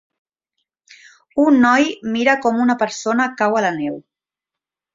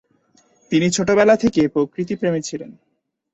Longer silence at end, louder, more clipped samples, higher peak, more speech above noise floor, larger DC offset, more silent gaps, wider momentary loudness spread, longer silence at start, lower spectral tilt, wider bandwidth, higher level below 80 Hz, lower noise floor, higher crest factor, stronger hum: first, 0.95 s vs 0.6 s; about the same, -17 LUFS vs -18 LUFS; neither; about the same, -2 dBFS vs -2 dBFS; first, 70 dB vs 41 dB; neither; neither; about the same, 12 LU vs 14 LU; first, 1.35 s vs 0.7 s; about the same, -4.5 dB/octave vs -5 dB/octave; about the same, 7.6 kHz vs 8.2 kHz; second, -62 dBFS vs -52 dBFS; first, -87 dBFS vs -59 dBFS; about the same, 18 dB vs 18 dB; neither